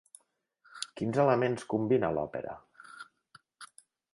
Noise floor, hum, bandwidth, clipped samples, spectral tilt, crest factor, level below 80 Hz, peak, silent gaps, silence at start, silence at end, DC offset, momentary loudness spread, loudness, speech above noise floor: -71 dBFS; none; 11.5 kHz; under 0.1%; -6 dB/octave; 22 dB; -66 dBFS; -12 dBFS; none; 0.75 s; 0.5 s; under 0.1%; 25 LU; -30 LUFS; 42 dB